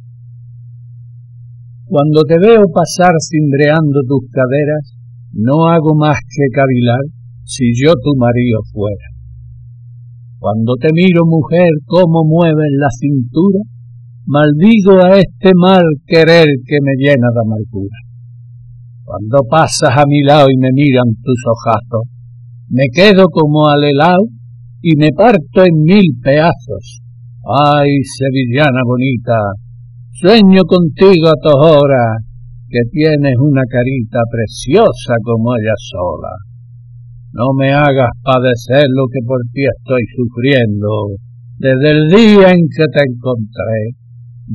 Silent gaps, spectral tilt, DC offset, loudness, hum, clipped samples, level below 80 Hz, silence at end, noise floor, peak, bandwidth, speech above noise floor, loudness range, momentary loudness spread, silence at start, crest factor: none; -7 dB/octave; under 0.1%; -10 LUFS; none; under 0.1%; -40 dBFS; 0 s; -34 dBFS; 0 dBFS; 12 kHz; 25 dB; 5 LU; 12 LU; 0.05 s; 10 dB